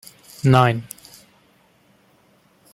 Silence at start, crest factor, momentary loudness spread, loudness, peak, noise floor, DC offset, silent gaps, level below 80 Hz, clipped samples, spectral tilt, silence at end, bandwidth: 0.45 s; 22 dB; 24 LU; -18 LUFS; -2 dBFS; -58 dBFS; under 0.1%; none; -58 dBFS; under 0.1%; -6.5 dB/octave; 1.9 s; 15.5 kHz